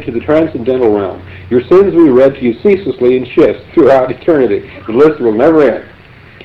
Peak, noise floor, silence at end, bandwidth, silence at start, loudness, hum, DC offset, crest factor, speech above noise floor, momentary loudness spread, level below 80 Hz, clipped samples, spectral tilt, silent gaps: 0 dBFS; -36 dBFS; 0.6 s; 6 kHz; 0 s; -10 LUFS; none; under 0.1%; 10 dB; 26 dB; 8 LU; -42 dBFS; under 0.1%; -8.5 dB/octave; none